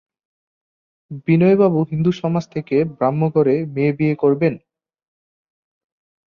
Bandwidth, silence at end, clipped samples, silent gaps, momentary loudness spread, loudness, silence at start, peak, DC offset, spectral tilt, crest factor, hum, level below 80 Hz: 6.8 kHz; 1.75 s; under 0.1%; none; 8 LU; -18 LUFS; 1.1 s; -4 dBFS; under 0.1%; -9.5 dB/octave; 16 dB; none; -58 dBFS